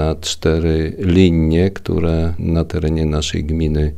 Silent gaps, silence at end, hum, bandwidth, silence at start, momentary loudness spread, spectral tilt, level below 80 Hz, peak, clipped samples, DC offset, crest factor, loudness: none; 0 s; none; 12.5 kHz; 0 s; 6 LU; -6.5 dB/octave; -26 dBFS; 0 dBFS; under 0.1%; under 0.1%; 16 dB; -17 LUFS